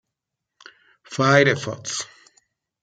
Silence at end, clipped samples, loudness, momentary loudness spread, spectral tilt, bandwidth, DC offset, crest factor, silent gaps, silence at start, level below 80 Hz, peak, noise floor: 0.8 s; under 0.1%; -20 LUFS; 17 LU; -4.5 dB/octave; 9.4 kHz; under 0.1%; 22 dB; none; 1.1 s; -64 dBFS; -2 dBFS; -83 dBFS